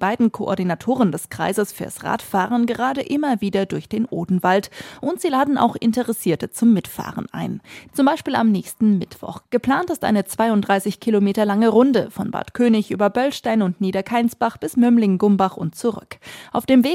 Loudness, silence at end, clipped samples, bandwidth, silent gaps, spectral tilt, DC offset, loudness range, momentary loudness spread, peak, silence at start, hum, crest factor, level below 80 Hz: -20 LUFS; 0 s; under 0.1%; 16.5 kHz; none; -6 dB/octave; under 0.1%; 3 LU; 11 LU; -4 dBFS; 0 s; none; 16 dB; -58 dBFS